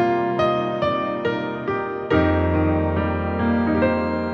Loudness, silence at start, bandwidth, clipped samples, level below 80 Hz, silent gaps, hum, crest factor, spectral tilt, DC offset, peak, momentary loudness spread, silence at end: -21 LUFS; 0 s; 6.2 kHz; under 0.1%; -38 dBFS; none; none; 14 dB; -8.5 dB/octave; under 0.1%; -8 dBFS; 6 LU; 0 s